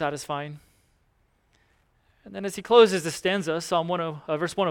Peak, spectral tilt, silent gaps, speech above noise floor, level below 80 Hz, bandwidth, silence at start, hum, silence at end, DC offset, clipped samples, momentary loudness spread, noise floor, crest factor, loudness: -4 dBFS; -4.5 dB/octave; none; 42 dB; -64 dBFS; 16.5 kHz; 0 s; none; 0 s; under 0.1%; under 0.1%; 16 LU; -67 dBFS; 22 dB; -24 LUFS